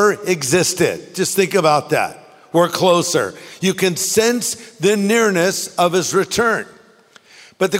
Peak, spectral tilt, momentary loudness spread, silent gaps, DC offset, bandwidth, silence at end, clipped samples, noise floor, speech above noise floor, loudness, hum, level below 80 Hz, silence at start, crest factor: -2 dBFS; -3.5 dB/octave; 7 LU; none; under 0.1%; 16.5 kHz; 0 s; under 0.1%; -49 dBFS; 32 dB; -17 LUFS; none; -58 dBFS; 0 s; 16 dB